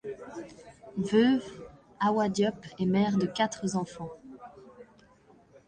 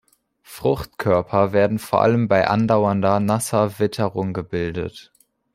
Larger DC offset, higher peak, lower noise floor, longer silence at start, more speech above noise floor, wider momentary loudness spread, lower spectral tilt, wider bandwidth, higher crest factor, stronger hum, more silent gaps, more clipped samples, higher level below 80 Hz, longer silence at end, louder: neither; second, -12 dBFS vs -2 dBFS; first, -59 dBFS vs -52 dBFS; second, 0.05 s vs 0.5 s; about the same, 32 dB vs 32 dB; first, 23 LU vs 8 LU; about the same, -6 dB/octave vs -6.5 dB/octave; second, 9.6 kHz vs 16 kHz; about the same, 18 dB vs 18 dB; neither; neither; neither; second, -64 dBFS vs -50 dBFS; first, 0.85 s vs 0.55 s; second, -28 LUFS vs -20 LUFS